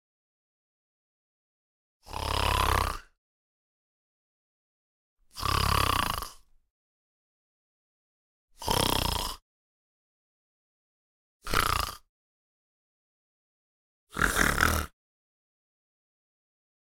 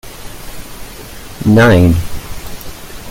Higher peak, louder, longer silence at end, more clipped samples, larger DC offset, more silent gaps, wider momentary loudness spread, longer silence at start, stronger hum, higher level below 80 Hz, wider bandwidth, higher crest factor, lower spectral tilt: second, -6 dBFS vs 0 dBFS; second, -28 LUFS vs -10 LUFS; first, 1.95 s vs 0 s; neither; neither; first, 3.18-5.17 s, 6.70-8.48 s, 9.42-11.40 s, 12.09-14.07 s vs none; second, 17 LU vs 23 LU; first, 2.05 s vs 0.05 s; neither; second, -42 dBFS vs -30 dBFS; about the same, 17 kHz vs 17 kHz; first, 26 dB vs 14 dB; second, -3 dB/octave vs -6.5 dB/octave